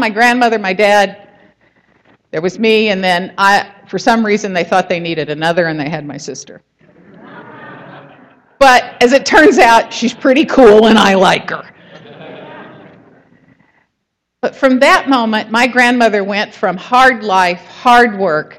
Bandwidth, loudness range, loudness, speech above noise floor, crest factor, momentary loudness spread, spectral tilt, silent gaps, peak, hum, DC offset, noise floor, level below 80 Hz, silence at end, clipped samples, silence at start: 16 kHz; 10 LU; -11 LUFS; 61 dB; 12 dB; 15 LU; -4 dB/octave; none; 0 dBFS; none; under 0.1%; -72 dBFS; -46 dBFS; 0.15 s; 0.1%; 0 s